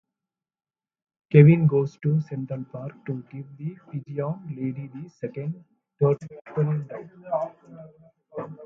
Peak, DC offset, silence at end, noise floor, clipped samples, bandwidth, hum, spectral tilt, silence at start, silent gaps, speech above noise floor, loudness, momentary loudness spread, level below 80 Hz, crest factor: -2 dBFS; under 0.1%; 0 s; under -90 dBFS; under 0.1%; 3.8 kHz; none; -11 dB/octave; 1.3 s; none; over 66 dB; -24 LUFS; 20 LU; -66 dBFS; 24 dB